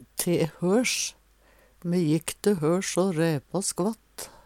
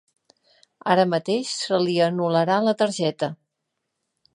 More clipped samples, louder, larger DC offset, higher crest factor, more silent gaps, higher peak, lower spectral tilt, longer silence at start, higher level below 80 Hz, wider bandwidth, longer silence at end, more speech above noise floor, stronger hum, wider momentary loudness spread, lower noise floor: neither; second, -26 LUFS vs -22 LUFS; neither; about the same, 22 dB vs 20 dB; neither; about the same, -6 dBFS vs -4 dBFS; about the same, -4.5 dB/octave vs -5 dB/octave; second, 0 s vs 0.85 s; first, -60 dBFS vs -76 dBFS; first, 17.5 kHz vs 11 kHz; second, 0.15 s vs 1 s; second, 34 dB vs 58 dB; neither; about the same, 7 LU vs 7 LU; second, -59 dBFS vs -79 dBFS